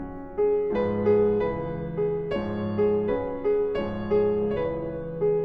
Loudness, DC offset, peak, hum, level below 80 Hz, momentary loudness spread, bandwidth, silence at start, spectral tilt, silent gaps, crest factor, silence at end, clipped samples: -26 LUFS; under 0.1%; -12 dBFS; none; -46 dBFS; 7 LU; 4.9 kHz; 0 s; -10 dB/octave; none; 14 dB; 0 s; under 0.1%